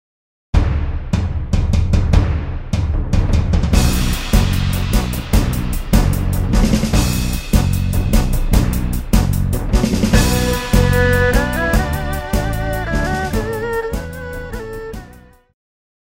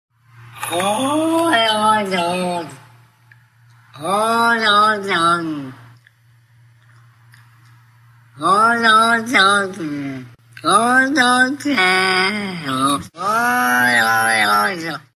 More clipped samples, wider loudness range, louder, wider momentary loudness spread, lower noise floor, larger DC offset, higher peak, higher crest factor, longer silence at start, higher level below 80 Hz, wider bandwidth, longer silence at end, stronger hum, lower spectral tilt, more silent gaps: neither; about the same, 5 LU vs 5 LU; second, -18 LUFS vs -15 LUFS; second, 8 LU vs 13 LU; second, -42 dBFS vs -52 dBFS; neither; about the same, 0 dBFS vs 0 dBFS; about the same, 16 dB vs 18 dB; first, 0.55 s vs 0.4 s; first, -18 dBFS vs -60 dBFS; about the same, 16.5 kHz vs 16 kHz; first, 0.95 s vs 0.15 s; neither; first, -5.5 dB/octave vs -3 dB/octave; neither